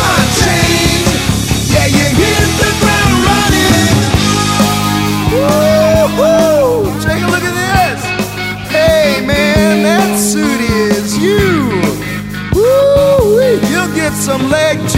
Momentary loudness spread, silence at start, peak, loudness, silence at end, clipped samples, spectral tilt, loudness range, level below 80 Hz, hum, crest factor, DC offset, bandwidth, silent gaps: 5 LU; 0 s; 0 dBFS; -10 LUFS; 0 s; under 0.1%; -4.5 dB/octave; 2 LU; -26 dBFS; none; 10 dB; under 0.1%; 16.5 kHz; none